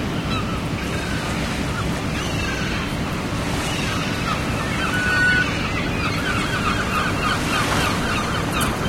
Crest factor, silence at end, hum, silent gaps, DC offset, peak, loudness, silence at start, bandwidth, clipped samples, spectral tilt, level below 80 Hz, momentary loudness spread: 14 dB; 0 s; none; none; under 0.1%; -8 dBFS; -21 LUFS; 0 s; 16.5 kHz; under 0.1%; -4.5 dB/octave; -34 dBFS; 5 LU